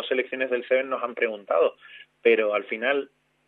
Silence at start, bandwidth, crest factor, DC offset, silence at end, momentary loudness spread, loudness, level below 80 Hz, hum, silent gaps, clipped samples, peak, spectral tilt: 0 s; 4.1 kHz; 18 dB; under 0.1%; 0.45 s; 7 LU; -25 LUFS; -84 dBFS; none; none; under 0.1%; -8 dBFS; -6.5 dB/octave